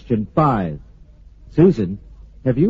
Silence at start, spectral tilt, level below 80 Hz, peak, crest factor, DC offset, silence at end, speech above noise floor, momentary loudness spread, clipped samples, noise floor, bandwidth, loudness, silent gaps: 0.05 s; -9 dB/octave; -40 dBFS; -2 dBFS; 16 dB; under 0.1%; 0 s; 27 dB; 15 LU; under 0.1%; -44 dBFS; 7.2 kHz; -18 LUFS; none